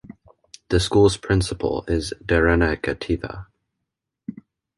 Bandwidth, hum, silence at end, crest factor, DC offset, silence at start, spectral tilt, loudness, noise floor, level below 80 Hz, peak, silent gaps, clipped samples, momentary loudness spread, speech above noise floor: 11.5 kHz; none; 0.45 s; 18 dB; under 0.1%; 0.7 s; -5.5 dB/octave; -21 LUFS; -81 dBFS; -34 dBFS; -4 dBFS; none; under 0.1%; 21 LU; 61 dB